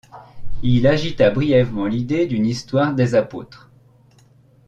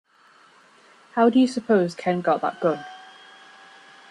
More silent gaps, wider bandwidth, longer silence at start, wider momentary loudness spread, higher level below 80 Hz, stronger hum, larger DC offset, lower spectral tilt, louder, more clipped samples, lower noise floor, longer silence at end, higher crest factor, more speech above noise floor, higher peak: neither; second, 8.8 kHz vs 10.5 kHz; second, 0.15 s vs 1.15 s; second, 9 LU vs 14 LU; first, -38 dBFS vs -72 dBFS; neither; neither; about the same, -7.5 dB/octave vs -6.5 dB/octave; first, -18 LUFS vs -22 LUFS; neither; about the same, -52 dBFS vs -55 dBFS; about the same, 1.1 s vs 1.1 s; about the same, 16 dB vs 18 dB; about the same, 34 dB vs 34 dB; first, -2 dBFS vs -6 dBFS